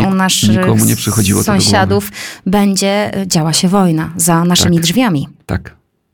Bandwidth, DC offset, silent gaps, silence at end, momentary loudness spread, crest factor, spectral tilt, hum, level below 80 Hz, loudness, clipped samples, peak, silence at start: 19 kHz; under 0.1%; none; 0.45 s; 10 LU; 12 dB; -4.5 dB/octave; none; -38 dBFS; -12 LUFS; under 0.1%; 0 dBFS; 0 s